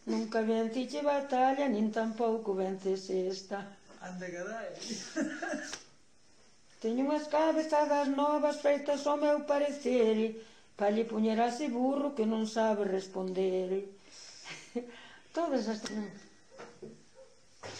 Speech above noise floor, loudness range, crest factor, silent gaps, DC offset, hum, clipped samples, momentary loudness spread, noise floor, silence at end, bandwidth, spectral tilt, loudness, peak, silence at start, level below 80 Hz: 34 dB; 9 LU; 16 dB; none; under 0.1%; none; under 0.1%; 17 LU; -66 dBFS; 0 s; 10 kHz; -5 dB/octave; -32 LUFS; -18 dBFS; 0.05 s; -76 dBFS